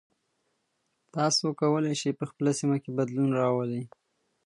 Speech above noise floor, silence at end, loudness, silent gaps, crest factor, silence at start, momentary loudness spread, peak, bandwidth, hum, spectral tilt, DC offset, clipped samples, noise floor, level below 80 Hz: 50 dB; 0.6 s; -28 LUFS; none; 16 dB; 1.15 s; 9 LU; -12 dBFS; 11 kHz; none; -5 dB/octave; under 0.1%; under 0.1%; -77 dBFS; -76 dBFS